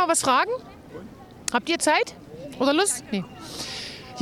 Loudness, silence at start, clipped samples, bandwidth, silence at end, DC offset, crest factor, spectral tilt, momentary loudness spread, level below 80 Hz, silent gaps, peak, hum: -24 LUFS; 0 s; under 0.1%; 18.5 kHz; 0 s; under 0.1%; 20 dB; -2.5 dB/octave; 21 LU; -58 dBFS; none; -6 dBFS; none